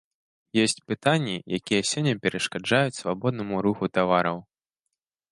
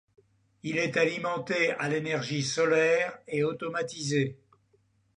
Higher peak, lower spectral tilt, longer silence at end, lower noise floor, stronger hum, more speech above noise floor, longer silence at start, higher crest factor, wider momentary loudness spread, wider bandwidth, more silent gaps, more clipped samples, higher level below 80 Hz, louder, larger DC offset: first, -4 dBFS vs -12 dBFS; about the same, -4.5 dB/octave vs -4.5 dB/octave; about the same, 0.9 s vs 0.8 s; first, -84 dBFS vs -68 dBFS; neither; first, 59 dB vs 40 dB; about the same, 0.55 s vs 0.65 s; about the same, 22 dB vs 18 dB; second, 5 LU vs 9 LU; first, 11.5 kHz vs 10 kHz; neither; neither; first, -62 dBFS vs -72 dBFS; first, -25 LUFS vs -28 LUFS; neither